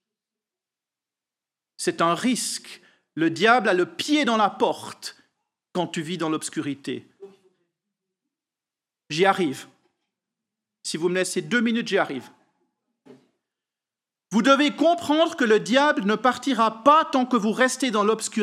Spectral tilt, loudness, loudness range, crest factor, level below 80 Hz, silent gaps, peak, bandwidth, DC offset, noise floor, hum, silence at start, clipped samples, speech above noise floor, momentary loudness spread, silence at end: -4 dB/octave; -22 LUFS; 10 LU; 22 dB; -84 dBFS; none; -2 dBFS; 15 kHz; under 0.1%; -90 dBFS; none; 1.8 s; under 0.1%; 68 dB; 14 LU; 0 s